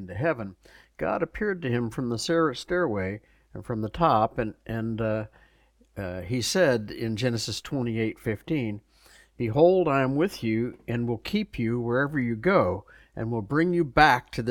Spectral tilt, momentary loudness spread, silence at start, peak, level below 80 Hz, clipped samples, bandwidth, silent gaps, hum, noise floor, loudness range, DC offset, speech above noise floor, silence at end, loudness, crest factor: -6 dB/octave; 13 LU; 0 s; -4 dBFS; -50 dBFS; under 0.1%; 18 kHz; none; none; -62 dBFS; 4 LU; under 0.1%; 36 dB; 0 s; -26 LUFS; 22 dB